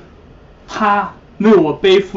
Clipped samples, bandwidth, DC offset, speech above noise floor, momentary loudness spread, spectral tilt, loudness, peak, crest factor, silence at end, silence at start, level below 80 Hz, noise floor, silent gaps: under 0.1%; 7.6 kHz; under 0.1%; 29 dB; 13 LU; -6 dB/octave; -13 LUFS; -2 dBFS; 12 dB; 0 s; 0.7 s; -46 dBFS; -41 dBFS; none